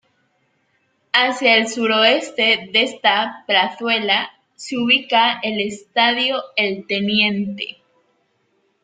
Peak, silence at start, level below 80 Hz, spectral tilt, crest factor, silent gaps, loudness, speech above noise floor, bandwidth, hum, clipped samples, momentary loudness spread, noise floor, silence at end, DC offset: 0 dBFS; 1.15 s; -66 dBFS; -3 dB/octave; 20 dB; none; -17 LUFS; 47 dB; 9.4 kHz; none; under 0.1%; 9 LU; -65 dBFS; 1.1 s; under 0.1%